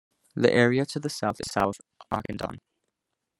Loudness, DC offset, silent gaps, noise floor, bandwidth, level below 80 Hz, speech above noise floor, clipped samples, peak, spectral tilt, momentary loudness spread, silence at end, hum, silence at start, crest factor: -26 LUFS; under 0.1%; none; -83 dBFS; 15.5 kHz; -58 dBFS; 57 dB; under 0.1%; -4 dBFS; -5.5 dB/octave; 15 LU; 0.8 s; none; 0.35 s; 22 dB